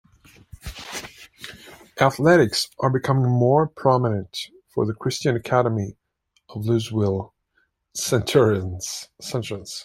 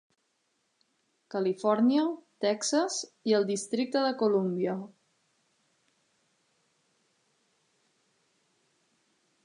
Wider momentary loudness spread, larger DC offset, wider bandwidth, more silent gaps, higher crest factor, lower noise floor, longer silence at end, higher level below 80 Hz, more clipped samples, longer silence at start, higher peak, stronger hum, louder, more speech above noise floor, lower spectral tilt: first, 20 LU vs 8 LU; neither; first, 16 kHz vs 11 kHz; neither; about the same, 20 dB vs 20 dB; second, -69 dBFS vs -76 dBFS; second, 0 s vs 4.6 s; first, -52 dBFS vs -86 dBFS; neither; second, 0.65 s vs 1.3 s; first, -2 dBFS vs -14 dBFS; neither; first, -22 LUFS vs -29 LUFS; about the same, 48 dB vs 48 dB; about the same, -5.5 dB/octave vs -4.5 dB/octave